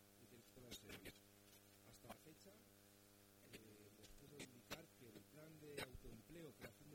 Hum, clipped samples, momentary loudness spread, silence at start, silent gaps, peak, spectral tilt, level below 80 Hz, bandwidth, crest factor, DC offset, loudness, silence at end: none; under 0.1%; 12 LU; 0 s; none; -38 dBFS; -3.5 dB/octave; -74 dBFS; 18 kHz; 24 dB; under 0.1%; -61 LUFS; 0 s